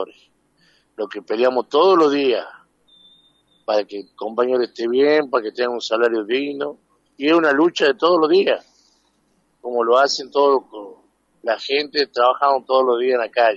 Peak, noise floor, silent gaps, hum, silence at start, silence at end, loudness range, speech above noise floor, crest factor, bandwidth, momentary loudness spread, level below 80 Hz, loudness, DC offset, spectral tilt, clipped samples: -2 dBFS; -64 dBFS; none; none; 0 s; 0 s; 3 LU; 46 dB; 16 dB; 7.8 kHz; 14 LU; -74 dBFS; -18 LUFS; under 0.1%; -4 dB/octave; under 0.1%